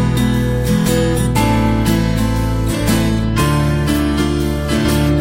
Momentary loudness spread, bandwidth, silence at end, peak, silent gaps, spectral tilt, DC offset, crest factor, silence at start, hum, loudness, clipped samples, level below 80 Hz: 3 LU; 16 kHz; 0 s; -2 dBFS; none; -6 dB/octave; under 0.1%; 12 dB; 0 s; none; -15 LUFS; under 0.1%; -22 dBFS